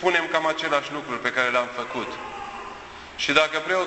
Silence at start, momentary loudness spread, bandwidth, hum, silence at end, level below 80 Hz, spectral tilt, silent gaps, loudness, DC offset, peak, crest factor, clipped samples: 0 s; 16 LU; 8.4 kHz; none; 0 s; -58 dBFS; -3 dB/octave; none; -24 LUFS; under 0.1%; -4 dBFS; 22 dB; under 0.1%